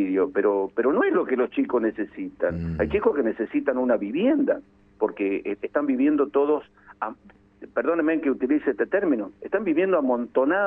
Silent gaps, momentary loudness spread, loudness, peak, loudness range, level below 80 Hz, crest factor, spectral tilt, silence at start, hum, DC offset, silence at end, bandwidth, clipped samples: none; 7 LU; -24 LUFS; -8 dBFS; 2 LU; -52 dBFS; 16 dB; -10 dB/octave; 0 s; 50 Hz at -60 dBFS; under 0.1%; 0 s; 3.7 kHz; under 0.1%